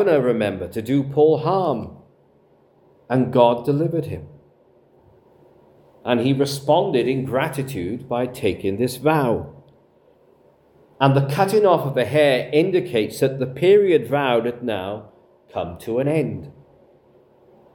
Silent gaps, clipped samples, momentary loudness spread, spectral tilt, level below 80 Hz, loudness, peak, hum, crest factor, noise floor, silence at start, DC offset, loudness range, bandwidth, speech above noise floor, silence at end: none; under 0.1%; 12 LU; -6.5 dB/octave; -58 dBFS; -20 LUFS; 0 dBFS; none; 20 dB; -56 dBFS; 0 s; under 0.1%; 6 LU; 18 kHz; 37 dB; 1.25 s